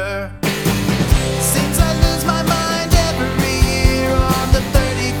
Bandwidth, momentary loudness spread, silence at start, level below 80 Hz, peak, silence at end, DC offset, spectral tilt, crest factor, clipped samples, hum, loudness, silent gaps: 19 kHz; 3 LU; 0 s; -20 dBFS; -2 dBFS; 0 s; 0.3%; -4.5 dB/octave; 14 dB; under 0.1%; none; -16 LUFS; none